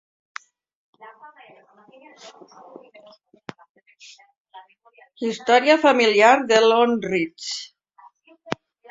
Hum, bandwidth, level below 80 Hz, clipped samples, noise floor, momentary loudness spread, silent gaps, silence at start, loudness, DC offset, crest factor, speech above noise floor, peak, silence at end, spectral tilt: none; 7.8 kHz; -70 dBFS; under 0.1%; -53 dBFS; 26 LU; 3.70-3.75 s, 4.40-4.45 s; 1.05 s; -18 LUFS; under 0.1%; 22 dB; 32 dB; -2 dBFS; 0.35 s; -3.5 dB/octave